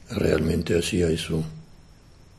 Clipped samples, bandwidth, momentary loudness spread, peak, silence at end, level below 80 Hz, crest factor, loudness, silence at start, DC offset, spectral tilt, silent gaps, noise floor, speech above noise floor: under 0.1%; 13 kHz; 11 LU; -6 dBFS; 0.45 s; -38 dBFS; 20 dB; -24 LUFS; 0.1 s; under 0.1%; -5.5 dB/octave; none; -50 dBFS; 27 dB